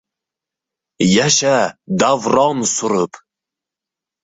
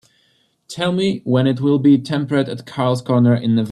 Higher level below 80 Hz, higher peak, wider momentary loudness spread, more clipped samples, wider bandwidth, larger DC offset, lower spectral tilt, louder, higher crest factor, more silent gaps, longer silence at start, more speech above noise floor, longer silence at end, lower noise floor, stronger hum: about the same, -56 dBFS vs -58 dBFS; about the same, -2 dBFS vs -4 dBFS; about the same, 7 LU vs 7 LU; neither; second, 8.4 kHz vs 11.5 kHz; neither; second, -3.5 dB/octave vs -7.5 dB/octave; about the same, -15 LUFS vs -17 LUFS; about the same, 16 dB vs 14 dB; neither; first, 1 s vs 0.7 s; first, 71 dB vs 45 dB; first, 1.05 s vs 0 s; first, -86 dBFS vs -61 dBFS; neither